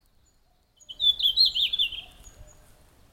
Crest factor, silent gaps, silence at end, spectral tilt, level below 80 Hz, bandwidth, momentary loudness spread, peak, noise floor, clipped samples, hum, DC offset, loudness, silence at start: 18 dB; none; 0.7 s; 0.5 dB/octave; -54 dBFS; 17.5 kHz; 16 LU; -10 dBFS; -64 dBFS; under 0.1%; none; under 0.1%; -21 LUFS; 0.9 s